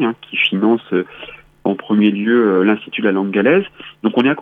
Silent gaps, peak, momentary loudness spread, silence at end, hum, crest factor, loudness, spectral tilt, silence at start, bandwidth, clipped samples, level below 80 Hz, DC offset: none; -2 dBFS; 10 LU; 0 s; none; 14 dB; -16 LUFS; -8.5 dB/octave; 0 s; 4.4 kHz; under 0.1%; -60 dBFS; under 0.1%